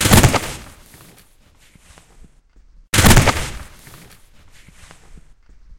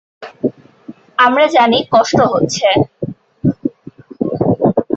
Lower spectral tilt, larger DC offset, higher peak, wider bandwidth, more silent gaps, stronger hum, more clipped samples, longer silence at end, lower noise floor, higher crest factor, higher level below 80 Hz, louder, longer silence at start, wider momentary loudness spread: about the same, -4 dB/octave vs -5 dB/octave; neither; about the same, 0 dBFS vs -2 dBFS; first, 17 kHz vs 8.2 kHz; neither; neither; neither; first, 0.6 s vs 0 s; first, -51 dBFS vs -37 dBFS; first, 20 dB vs 14 dB; first, -28 dBFS vs -48 dBFS; about the same, -14 LUFS vs -14 LUFS; second, 0 s vs 0.2 s; first, 24 LU vs 12 LU